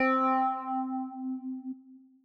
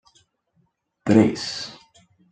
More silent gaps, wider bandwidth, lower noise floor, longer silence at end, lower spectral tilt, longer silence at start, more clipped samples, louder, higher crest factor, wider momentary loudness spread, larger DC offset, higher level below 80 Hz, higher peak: neither; second, 5.2 kHz vs 9.2 kHz; second, -54 dBFS vs -68 dBFS; second, 0.25 s vs 0.55 s; about the same, -6 dB/octave vs -6 dB/octave; second, 0 s vs 1.05 s; neither; second, -31 LUFS vs -21 LUFS; second, 14 dB vs 22 dB; about the same, 16 LU vs 15 LU; neither; second, -86 dBFS vs -62 dBFS; second, -18 dBFS vs -2 dBFS